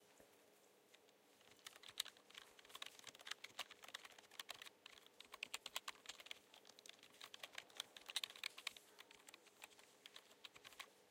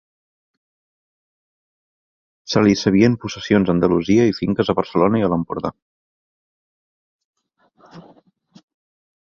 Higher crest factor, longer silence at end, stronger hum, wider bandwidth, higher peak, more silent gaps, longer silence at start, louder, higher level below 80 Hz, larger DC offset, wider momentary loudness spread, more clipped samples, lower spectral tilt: first, 34 dB vs 20 dB; second, 0 s vs 1.35 s; neither; first, 16.5 kHz vs 7 kHz; second, -24 dBFS vs -2 dBFS; second, none vs 5.82-7.33 s; second, 0 s vs 2.5 s; second, -54 LUFS vs -18 LUFS; second, under -90 dBFS vs -50 dBFS; neither; first, 14 LU vs 9 LU; neither; second, 1 dB/octave vs -6.5 dB/octave